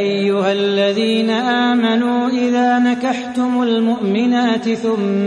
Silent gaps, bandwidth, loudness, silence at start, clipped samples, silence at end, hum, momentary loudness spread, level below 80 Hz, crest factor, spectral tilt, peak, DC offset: none; 10 kHz; -16 LUFS; 0 s; under 0.1%; 0 s; none; 4 LU; -64 dBFS; 12 dB; -5.5 dB/octave; -2 dBFS; under 0.1%